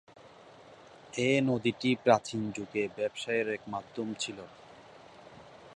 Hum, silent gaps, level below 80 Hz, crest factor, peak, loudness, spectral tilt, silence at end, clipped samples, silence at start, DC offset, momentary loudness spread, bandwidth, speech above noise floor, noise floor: none; none; -70 dBFS; 24 dB; -8 dBFS; -31 LUFS; -5 dB/octave; 0 s; under 0.1%; 0.2 s; under 0.1%; 25 LU; 11 kHz; 23 dB; -54 dBFS